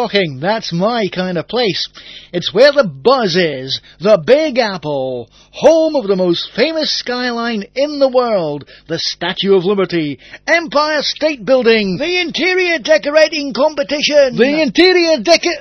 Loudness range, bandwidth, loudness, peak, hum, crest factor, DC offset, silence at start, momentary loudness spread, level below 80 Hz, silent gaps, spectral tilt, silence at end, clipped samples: 4 LU; 7.8 kHz; -14 LUFS; 0 dBFS; none; 14 dB; under 0.1%; 0 s; 10 LU; -50 dBFS; none; -4.5 dB/octave; 0 s; 0.1%